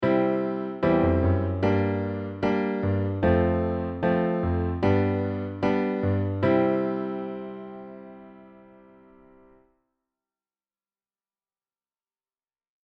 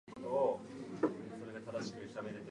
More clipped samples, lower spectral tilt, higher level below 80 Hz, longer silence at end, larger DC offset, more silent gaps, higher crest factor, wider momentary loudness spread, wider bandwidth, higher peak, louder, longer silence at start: neither; first, -10 dB/octave vs -6 dB/octave; first, -46 dBFS vs -76 dBFS; first, 4.35 s vs 0 s; neither; neither; about the same, 16 dB vs 20 dB; about the same, 12 LU vs 12 LU; second, 6 kHz vs 11 kHz; first, -10 dBFS vs -20 dBFS; first, -25 LUFS vs -40 LUFS; about the same, 0 s vs 0.05 s